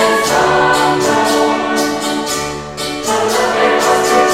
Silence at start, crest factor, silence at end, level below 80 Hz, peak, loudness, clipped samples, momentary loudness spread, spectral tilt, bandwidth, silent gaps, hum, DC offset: 0 s; 12 dB; 0 s; -44 dBFS; -2 dBFS; -13 LUFS; under 0.1%; 8 LU; -3 dB/octave; 16.5 kHz; none; none; under 0.1%